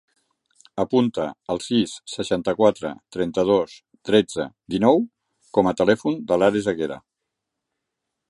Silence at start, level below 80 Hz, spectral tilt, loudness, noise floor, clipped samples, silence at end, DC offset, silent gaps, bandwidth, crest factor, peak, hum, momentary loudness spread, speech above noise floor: 0.75 s; -56 dBFS; -5.5 dB/octave; -22 LUFS; -82 dBFS; under 0.1%; 1.3 s; under 0.1%; none; 11.5 kHz; 20 dB; -2 dBFS; none; 12 LU; 61 dB